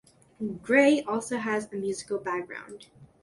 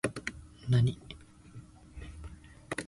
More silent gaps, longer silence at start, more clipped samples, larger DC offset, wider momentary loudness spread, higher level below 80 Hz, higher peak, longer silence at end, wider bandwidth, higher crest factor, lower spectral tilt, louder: neither; first, 0.4 s vs 0.05 s; neither; neither; second, 19 LU vs 24 LU; second, -68 dBFS vs -52 dBFS; first, -8 dBFS vs -16 dBFS; first, 0.15 s vs 0 s; about the same, 11.5 kHz vs 11.5 kHz; about the same, 20 dB vs 18 dB; second, -4.5 dB/octave vs -6 dB/octave; first, -27 LUFS vs -32 LUFS